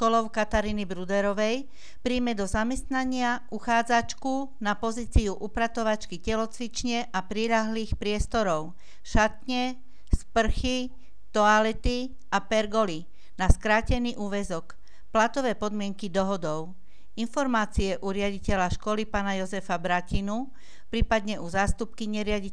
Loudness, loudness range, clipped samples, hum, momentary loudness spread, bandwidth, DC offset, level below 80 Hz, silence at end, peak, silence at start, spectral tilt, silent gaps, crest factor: -28 LUFS; 3 LU; under 0.1%; none; 8 LU; 11 kHz; 2%; -36 dBFS; 0 s; -4 dBFS; 0 s; -5 dB/octave; none; 22 dB